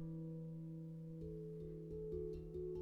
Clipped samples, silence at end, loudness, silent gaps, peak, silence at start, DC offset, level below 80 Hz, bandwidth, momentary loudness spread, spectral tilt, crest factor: under 0.1%; 0 s; -49 LUFS; none; -34 dBFS; 0 s; under 0.1%; -60 dBFS; 4.5 kHz; 4 LU; -11 dB/octave; 14 dB